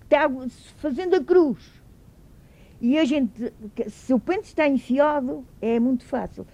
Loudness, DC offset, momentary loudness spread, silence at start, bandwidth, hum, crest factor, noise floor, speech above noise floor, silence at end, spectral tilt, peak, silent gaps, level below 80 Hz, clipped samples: -23 LUFS; under 0.1%; 13 LU; 0.1 s; 10.5 kHz; none; 16 dB; -50 dBFS; 27 dB; 0.1 s; -6 dB/octave; -6 dBFS; none; -52 dBFS; under 0.1%